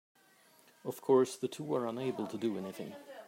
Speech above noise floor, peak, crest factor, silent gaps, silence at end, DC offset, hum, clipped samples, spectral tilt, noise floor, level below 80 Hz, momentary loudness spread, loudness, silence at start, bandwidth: 31 dB; -16 dBFS; 20 dB; none; 0 s; under 0.1%; none; under 0.1%; -6 dB/octave; -65 dBFS; -86 dBFS; 16 LU; -35 LUFS; 0.85 s; 16 kHz